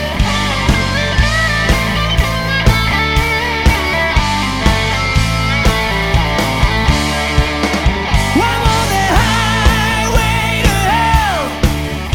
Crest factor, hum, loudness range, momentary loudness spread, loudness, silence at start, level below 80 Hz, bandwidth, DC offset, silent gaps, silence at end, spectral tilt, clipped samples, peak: 12 dB; none; 1 LU; 3 LU; -13 LUFS; 0 s; -18 dBFS; 18 kHz; under 0.1%; none; 0 s; -4.5 dB/octave; under 0.1%; 0 dBFS